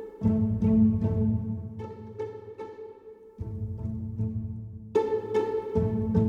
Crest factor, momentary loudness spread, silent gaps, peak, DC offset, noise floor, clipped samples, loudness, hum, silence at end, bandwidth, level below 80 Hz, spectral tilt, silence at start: 16 dB; 17 LU; none; -12 dBFS; under 0.1%; -48 dBFS; under 0.1%; -28 LUFS; none; 0 s; 7 kHz; -46 dBFS; -10.5 dB/octave; 0 s